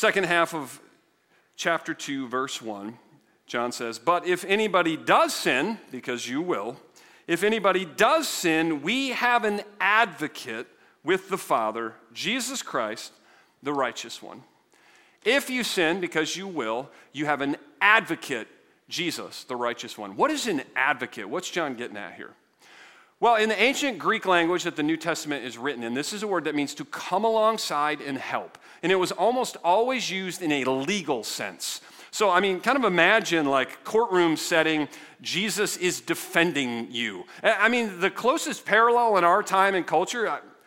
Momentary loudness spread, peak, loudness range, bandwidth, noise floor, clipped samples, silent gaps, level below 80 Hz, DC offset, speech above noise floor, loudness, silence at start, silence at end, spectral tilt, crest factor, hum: 13 LU; -2 dBFS; 6 LU; 16.5 kHz; -65 dBFS; under 0.1%; none; -74 dBFS; under 0.1%; 40 dB; -25 LUFS; 0 s; 0.2 s; -3 dB/octave; 24 dB; none